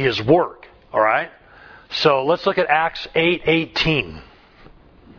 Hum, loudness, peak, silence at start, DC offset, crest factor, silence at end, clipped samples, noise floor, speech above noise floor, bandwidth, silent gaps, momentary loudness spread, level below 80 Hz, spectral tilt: none; -19 LUFS; -2 dBFS; 0 s; under 0.1%; 18 dB; 0.95 s; under 0.1%; -47 dBFS; 28 dB; 5.4 kHz; none; 9 LU; -46 dBFS; -6 dB/octave